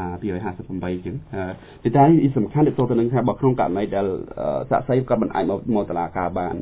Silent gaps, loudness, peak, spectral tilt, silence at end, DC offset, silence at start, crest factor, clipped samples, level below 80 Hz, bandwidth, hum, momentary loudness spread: none; -21 LUFS; -2 dBFS; -12.5 dB/octave; 0 s; under 0.1%; 0 s; 18 dB; under 0.1%; -46 dBFS; 4 kHz; none; 13 LU